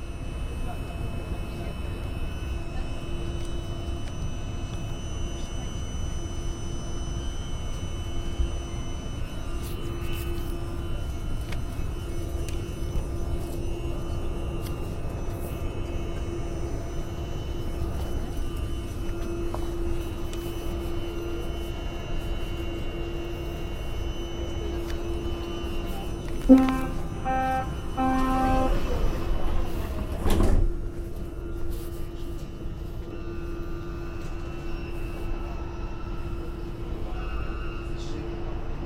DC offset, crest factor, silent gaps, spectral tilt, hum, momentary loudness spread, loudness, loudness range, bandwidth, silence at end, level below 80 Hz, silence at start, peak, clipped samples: 0.4%; 26 dB; none; -6.5 dB/octave; none; 8 LU; -32 LUFS; 10 LU; 16 kHz; 0 s; -32 dBFS; 0 s; -2 dBFS; under 0.1%